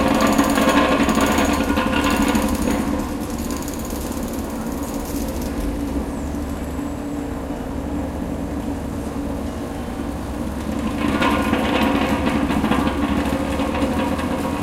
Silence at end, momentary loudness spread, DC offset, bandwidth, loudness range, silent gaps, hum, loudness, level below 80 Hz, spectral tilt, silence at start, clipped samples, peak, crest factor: 0 s; 10 LU; under 0.1%; 17 kHz; 8 LU; none; none; -21 LUFS; -32 dBFS; -5 dB/octave; 0 s; under 0.1%; -2 dBFS; 18 dB